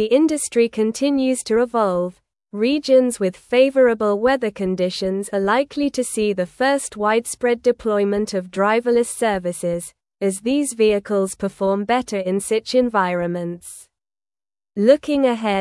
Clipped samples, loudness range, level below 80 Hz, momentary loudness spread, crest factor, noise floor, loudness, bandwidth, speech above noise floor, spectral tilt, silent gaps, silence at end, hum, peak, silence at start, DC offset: under 0.1%; 3 LU; -54 dBFS; 8 LU; 18 dB; under -90 dBFS; -19 LUFS; 12 kHz; over 71 dB; -4.5 dB/octave; none; 0 s; none; -2 dBFS; 0 s; under 0.1%